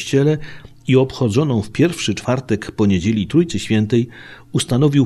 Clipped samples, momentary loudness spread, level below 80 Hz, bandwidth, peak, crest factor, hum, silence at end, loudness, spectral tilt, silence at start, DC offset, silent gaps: under 0.1%; 8 LU; -44 dBFS; 13.5 kHz; -2 dBFS; 14 dB; none; 0 s; -18 LUFS; -6.5 dB/octave; 0 s; 0.3%; none